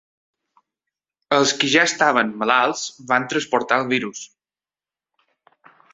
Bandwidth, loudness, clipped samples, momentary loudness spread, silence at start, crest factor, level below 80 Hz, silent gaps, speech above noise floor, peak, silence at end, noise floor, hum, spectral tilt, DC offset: 8.4 kHz; -19 LUFS; under 0.1%; 11 LU; 1.3 s; 22 dB; -66 dBFS; none; over 71 dB; 0 dBFS; 1.7 s; under -90 dBFS; none; -2.5 dB/octave; under 0.1%